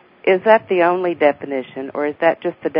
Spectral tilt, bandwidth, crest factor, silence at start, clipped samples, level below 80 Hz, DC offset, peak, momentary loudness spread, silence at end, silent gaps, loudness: -10.5 dB/octave; 5.2 kHz; 18 dB; 0.25 s; under 0.1%; -66 dBFS; under 0.1%; 0 dBFS; 12 LU; 0 s; none; -17 LUFS